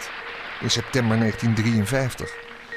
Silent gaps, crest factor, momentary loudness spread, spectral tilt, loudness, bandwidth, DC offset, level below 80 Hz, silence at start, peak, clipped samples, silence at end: none; 16 dB; 12 LU; -5 dB/octave; -23 LUFS; 15.5 kHz; under 0.1%; -48 dBFS; 0 s; -8 dBFS; under 0.1%; 0 s